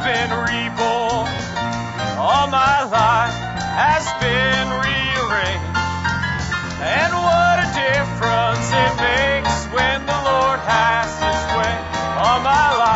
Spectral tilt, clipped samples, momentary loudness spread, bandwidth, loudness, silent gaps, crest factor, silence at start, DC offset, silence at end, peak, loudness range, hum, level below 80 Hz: -4 dB/octave; under 0.1%; 7 LU; 8 kHz; -18 LUFS; none; 16 dB; 0 s; under 0.1%; 0 s; -2 dBFS; 2 LU; none; -36 dBFS